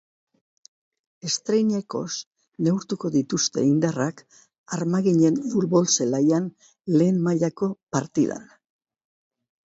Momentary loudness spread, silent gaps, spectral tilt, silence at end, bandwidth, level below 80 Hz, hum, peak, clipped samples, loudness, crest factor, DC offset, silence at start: 12 LU; 2.26-2.31 s, 4.58-4.64 s, 7.83-7.87 s; -5.5 dB/octave; 1.25 s; 8 kHz; -66 dBFS; none; -6 dBFS; under 0.1%; -23 LUFS; 18 dB; under 0.1%; 1.25 s